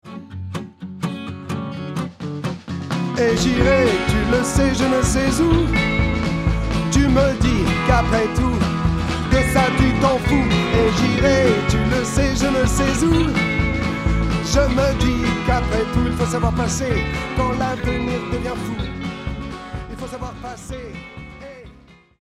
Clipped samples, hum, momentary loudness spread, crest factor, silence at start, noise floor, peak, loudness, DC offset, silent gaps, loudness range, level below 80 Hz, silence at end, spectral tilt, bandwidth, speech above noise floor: under 0.1%; none; 14 LU; 16 dB; 0.05 s; -48 dBFS; -2 dBFS; -19 LUFS; under 0.1%; none; 9 LU; -28 dBFS; 0.5 s; -5.5 dB/octave; 14.5 kHz; 30 dB